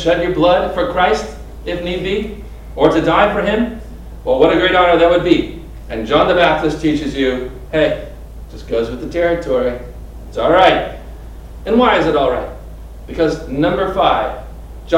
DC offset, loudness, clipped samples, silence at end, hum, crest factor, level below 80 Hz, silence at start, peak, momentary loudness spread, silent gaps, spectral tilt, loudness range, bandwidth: under 0.1%; -15 LUFS; under 0.1%; 0 s; none; 16 dB; -32 dBFS; 0 s; 0 dBFS; 22 LU; none; -6 dB/octave; 4 LU; 15.5 kHz